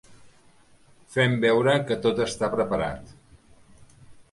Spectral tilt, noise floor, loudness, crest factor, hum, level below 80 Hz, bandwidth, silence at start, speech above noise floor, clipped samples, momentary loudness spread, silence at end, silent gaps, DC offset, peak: -5.5 dB/octave; -56 dBFS; -24 LUFS; 18 dB; none; -54 dBFS; 11.5 kHz; 0.1 s; 33 dB; under 0.1%; 10 LU; 0.1 s; none; under 0.1%; -8 dBFS